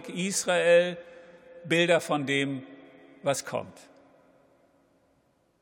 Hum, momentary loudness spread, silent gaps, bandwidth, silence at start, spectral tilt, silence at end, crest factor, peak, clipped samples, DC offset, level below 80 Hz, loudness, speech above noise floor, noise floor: none; 21 LU; none; 17 kHz; 0 s; -3.5 dB/octave; 1.9 s; 20 dB; -8 dBFS; under 0.1%; under 0.1%; -78 dBFS; -26 LUFS; 42 dB; -68 dBFS